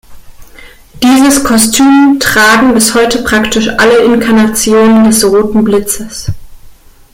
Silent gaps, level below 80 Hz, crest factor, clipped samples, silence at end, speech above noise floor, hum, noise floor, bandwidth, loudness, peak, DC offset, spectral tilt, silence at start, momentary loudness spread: none; -32 dBFS; 8 dB; 0.2%; 0.45 s; 27 dB; none; -34 dBFS; 17 kHz; -7 LUFS; 0 dBFS; under 0.1%; -3.5 dB/octave; 0.1 s; 8 LU